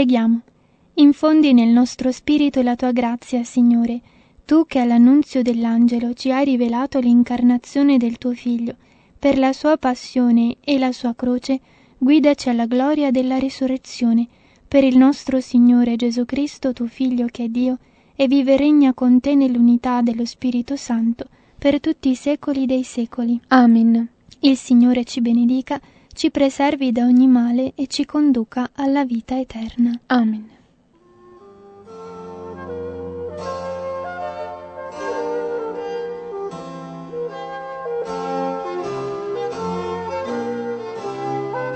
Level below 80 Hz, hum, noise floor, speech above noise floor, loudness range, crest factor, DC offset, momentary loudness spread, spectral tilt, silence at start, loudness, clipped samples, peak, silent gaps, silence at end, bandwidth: -54 dBFS; none; -55 dBFS; 38 dB; 11 LU; 18 dB; under 0.1%; 15 LU; -5.5 dB/octave; 0 s; -18 LUFS; under 0.1%; 0 dBFS; none; 0 s; 8.6 kHz